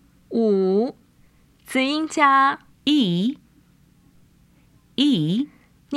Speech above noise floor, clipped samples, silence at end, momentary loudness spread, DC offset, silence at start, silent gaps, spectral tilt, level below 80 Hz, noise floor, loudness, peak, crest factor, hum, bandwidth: 37 dB; under 0.1%; 0 s; 12 LU; under 0.1%; 0.3 s; none; -5.5 dB/octave; -64 dBFS; -56 dBFS; -21 LUFS; -2 dBFS; 20 dB; none; 13 kHz